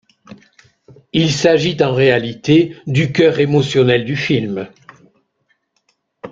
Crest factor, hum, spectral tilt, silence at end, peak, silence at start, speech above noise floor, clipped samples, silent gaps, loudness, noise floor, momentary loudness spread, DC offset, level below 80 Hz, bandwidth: 16 dB; none; -6 dB/octave; 0.05 s; -2 dBFS; 0.3 s; 51 dB; under 0.1%; none; -15 LUFS; -65 dBFS; 8 LU; under 0.1%; -52 dBFS; 7.8 kHz